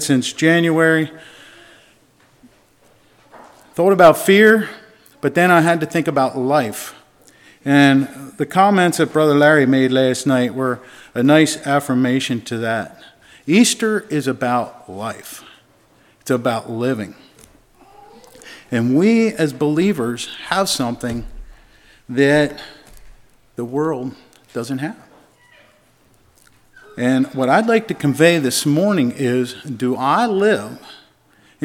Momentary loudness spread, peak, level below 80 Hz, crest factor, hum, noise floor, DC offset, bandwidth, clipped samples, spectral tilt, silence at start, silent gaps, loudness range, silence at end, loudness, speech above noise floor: 17 LU; 0 dBFS; -50 dBFS; 18 dB; none; -54 dBFS; under 0.1%; 17 kHz; under 0.1%; -5 dB/octave; 0 s; none; 11 LU; 0.7 s; -16 LUFS; 38 dB